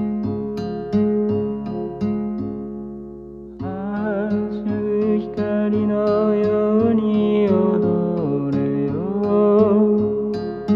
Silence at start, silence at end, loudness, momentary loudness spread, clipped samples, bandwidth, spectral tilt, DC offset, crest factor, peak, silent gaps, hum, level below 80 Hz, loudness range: 0 s; 0 s; -20 LUFS; 12 LU; under 0.1%; 5.6 kHz; -10 dB/octave; under 0.1%; 14 dB; -4 dBFS; none; none; -50 dBFS; 7 LU